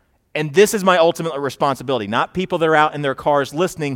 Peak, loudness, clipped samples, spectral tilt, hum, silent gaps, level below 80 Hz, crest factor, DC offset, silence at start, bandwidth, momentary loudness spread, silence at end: 0 dBFS; -18 LUFS; under 0.1%; -4.5 dB/octave; none; none; -54 dBFS; 18 dB; under 0.1%; 0.35 s; 17 kHz; 8 LU; 0 s